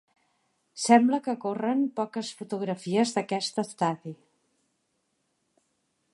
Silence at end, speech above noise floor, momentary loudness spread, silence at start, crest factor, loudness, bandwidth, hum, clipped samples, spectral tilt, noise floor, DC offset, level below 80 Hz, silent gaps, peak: 2 s; 49 dB; 14 LU; 0.75 s; 24 dB; -27 LUFS; 11.5 kHz; none; under 0.1%; -4.5 dB/octave; -76 dBFS; under 0.1%; -80 dBFS; none; -6 dBFS